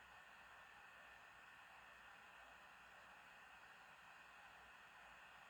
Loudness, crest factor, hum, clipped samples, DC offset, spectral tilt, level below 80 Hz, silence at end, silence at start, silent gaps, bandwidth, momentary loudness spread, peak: -62 LUFS; 12 dB; none; under 0.1%; under 0.1%; -2 dB/octave; -84 dBFS; 0 s; 0 s; none; over 20 kHz; 1 LU; -50 dBFS